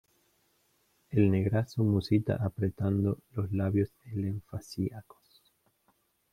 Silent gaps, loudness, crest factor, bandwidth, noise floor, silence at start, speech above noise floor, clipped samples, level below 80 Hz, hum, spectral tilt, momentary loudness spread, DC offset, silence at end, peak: none; -31 LUFS; 20 dB; 14 kHz; -72 dBFS; 1.1 s; 43 dB; under 0.1%; -60 dBFS; none; -8.5 dB/octave; 9 LU; under 0.1%; 1.3 s; -12 dBFS